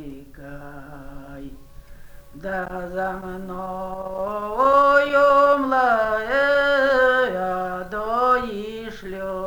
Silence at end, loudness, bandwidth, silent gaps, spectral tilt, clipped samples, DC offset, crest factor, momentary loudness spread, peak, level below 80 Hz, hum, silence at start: 0 s; -20 LUFS; over 20 kHz; none; -5.5 dB/octave; under 0.1%; under 0.1%; 18 dB; 24 LU; -4 dBFS; -44 dBFS; none; 0 s